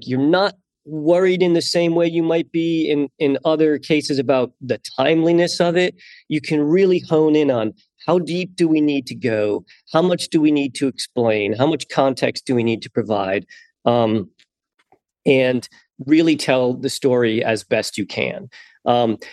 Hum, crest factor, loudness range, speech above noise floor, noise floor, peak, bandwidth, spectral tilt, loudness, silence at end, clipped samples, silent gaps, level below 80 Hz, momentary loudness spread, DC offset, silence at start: none; 18 dB; 3 LU; 47 dB; -65 dBFS; 0 dBFS; 12.5 kHz; -5.5 dB/octave; -19 LUFS; 0 s; under 0.1%; none; -66 dBFS; 8 LU; under 0.1%; 0 s